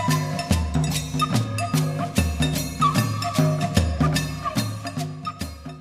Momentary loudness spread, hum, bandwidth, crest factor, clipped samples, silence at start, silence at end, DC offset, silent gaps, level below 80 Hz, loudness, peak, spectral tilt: 9 LU; none; 15.5 kHz; 18 dB; under 0.1%; 0 s; 0 s; under 0.1%; none; -34 dBFS; -24 LUFS; -4 dBFS; -5 dB/octave